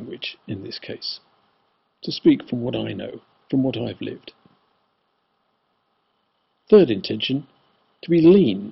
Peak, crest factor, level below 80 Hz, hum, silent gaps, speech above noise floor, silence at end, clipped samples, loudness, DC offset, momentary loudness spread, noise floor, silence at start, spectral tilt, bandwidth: -2 dBFS; 20 dB; -60 dBFS; none; none; 50 dB; 0 s; under 0.1%; -20 LUFS; under 0.1%; 19 LU; -70 dBFS; 0 s; -6 dB/octave; 6 kHz